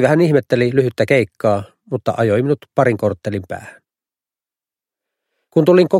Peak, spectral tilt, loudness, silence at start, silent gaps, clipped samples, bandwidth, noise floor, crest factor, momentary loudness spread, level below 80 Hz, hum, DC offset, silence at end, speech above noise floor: 0 dBFS; -7.5 dB/octave; -17 LUFS; 0 s; none; under 0.1%; 14 kHz; under -90 dBFS; 16 dB; 12 LU; -56 dBFS; none; under 0.1%; 0 s; over 75 dB